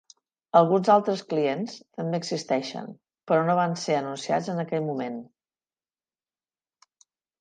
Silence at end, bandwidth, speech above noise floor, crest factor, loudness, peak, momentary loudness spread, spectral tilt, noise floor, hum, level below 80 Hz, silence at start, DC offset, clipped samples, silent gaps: 2.15 s; 9.6 kHz; over 65 dB; 22 dB; -25 LUFS; -6 dBFS; 15 LU; -6 dB/octave; under -90 dBFS; none; -78 dBFS; 0.55 s; under 0.1%; under 0.1%; none